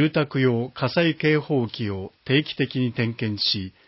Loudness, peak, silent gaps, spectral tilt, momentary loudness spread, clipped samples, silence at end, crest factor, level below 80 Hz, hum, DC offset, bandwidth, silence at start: -23 LUFS; -8 dBFS; none; -10 dB/octave; 6 LU; under 0.1%; 0.2 s; 16 dB; -54 dBFS; none; under 0.1%; 5.8 kHz; 0 s